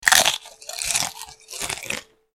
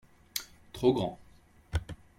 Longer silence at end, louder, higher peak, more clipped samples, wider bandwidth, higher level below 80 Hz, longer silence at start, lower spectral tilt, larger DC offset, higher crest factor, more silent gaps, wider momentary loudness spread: about the same, 0.3 s vs 0.25 s; first, -22 LUFS vs -33 LUFS; first, 0 dBFS vs -14 dBFS; neither; about the same, 17 kHz vs 16.5 kHz; second, -54 dBFS vs -48 dBFS; second, 0 s vs 0.35 s; second, 1 dB/octave vs -5.5 dB/octave; neither; about the same, 24 dB vs 20 dB; neither; first, 18 LU vs 15 LU